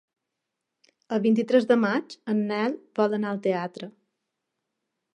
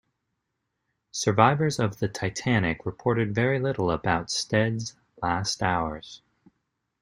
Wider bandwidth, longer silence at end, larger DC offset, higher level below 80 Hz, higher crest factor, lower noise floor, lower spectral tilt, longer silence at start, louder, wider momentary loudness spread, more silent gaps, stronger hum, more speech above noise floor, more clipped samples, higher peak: second, 8.8 kHz vs 15.5 kHz; first, 1.25 s vs 0.85 s; neither; second, -80 dBFS vs -54 dBFS; about the same, 20 dB vs 24 dB; first, -84 dBFS vs -80 dBFS; first, -7 dB/octave vs -5 dB/octave; about the same, 1.1 s vs 1.15 s; about the same, -25 LUFS vs -26 LUFS; about the same, 10 LU vs 12 LU; neither; neither; first, 59 dB vs 55 dB; neither; second, -8 dBFS vs -2 dBFS